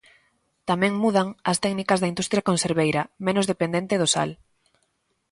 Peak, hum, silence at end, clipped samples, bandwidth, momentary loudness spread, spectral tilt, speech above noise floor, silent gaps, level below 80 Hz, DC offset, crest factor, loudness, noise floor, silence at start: -6 dBFS; none; 0.95 s; under 0.1%; 11.5 kHz; 4 LU; -4.5 dB/octave; 49 dB; none; -60 dBFS; under 0.1%; 18 dB; -23 LUFS; -72 dBFS; 0.65 s